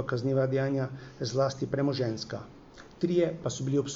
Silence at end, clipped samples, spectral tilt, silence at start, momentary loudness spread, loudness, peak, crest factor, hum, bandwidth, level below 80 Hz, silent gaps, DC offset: 0 s; under 0.1%; -6 dB/octave; 0 s; 10 LU; -30 LUFS; -14 dBFS; 16 dB; none; 7.8 kHz; -60 dBFS; none; under 0.1%